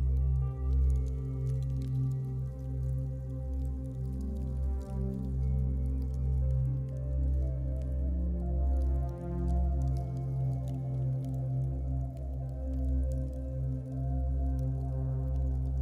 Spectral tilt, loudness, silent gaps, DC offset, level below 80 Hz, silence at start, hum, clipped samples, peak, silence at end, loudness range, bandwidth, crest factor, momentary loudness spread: -10.5 dB/octave; -34 LUFS; none; under 0.1%; -34 dBFS; 0 s; none; under 0.1%; -20 dBFS; 0 s; 2 LU; 1.9 kHz; 10 dB; 6 LU